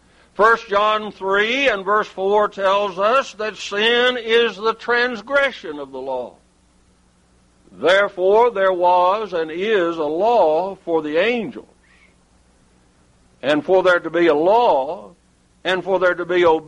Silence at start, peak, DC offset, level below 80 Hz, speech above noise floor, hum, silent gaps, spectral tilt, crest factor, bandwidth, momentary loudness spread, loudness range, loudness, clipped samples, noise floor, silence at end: 0.4 s; -4 dBFS; under 0.1%; -56 dBFS; 39 dB; none; none; -4.5 dB/octave; 16 dB; 11 kHz; 12 LU; 5 LU; -18 LUFS; under 0.1%; -56 dBFS; 0.05 s